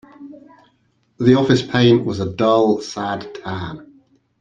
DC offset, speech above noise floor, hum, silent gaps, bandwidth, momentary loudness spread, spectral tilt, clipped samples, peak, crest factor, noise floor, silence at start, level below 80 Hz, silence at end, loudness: under 0.1%; 46 dB; none; none; 9 kHz; 14 LU; -6.5 dB/octave; under 0.1%; -2 dBFS; 18 dB; -62 dBFS; 0.2 s; -54 dBFS; 0.55 s; -17 LUFS